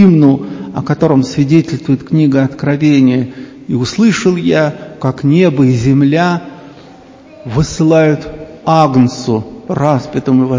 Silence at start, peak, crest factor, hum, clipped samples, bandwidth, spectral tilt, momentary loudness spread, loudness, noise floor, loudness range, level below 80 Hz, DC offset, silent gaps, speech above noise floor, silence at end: 0 s; 0 dBFS; 12 dB; none; 0.4%; 7.6 kHz; -7 dB/octave; 11 LU; -12 LUFS; -37 dBFS; 2 LU; -40 dBFS; under 0.1%; none; 26 dB; 0 s